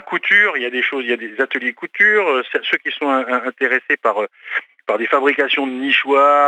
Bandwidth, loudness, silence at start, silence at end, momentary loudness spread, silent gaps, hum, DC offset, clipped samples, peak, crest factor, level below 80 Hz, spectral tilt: 9 kHz; -16 LUFS; 0.05 s; 0 s; 10 LU; none; none; under 0.1%; under 0.1%; -2 dBFS; 16 dB; -80 dBFS; -3.5 dB/octave